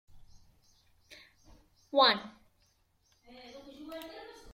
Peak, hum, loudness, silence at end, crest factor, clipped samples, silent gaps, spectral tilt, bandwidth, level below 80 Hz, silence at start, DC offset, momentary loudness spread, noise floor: -12 dBFS; none; -28 LUFS; 0.2 s; 24 dB; under 0.1%; none; -3.5 dB/octave; 16.5 kHz; -66 dBFS; 1.95 s; under 0.1%; 29 LU; -71 dBFS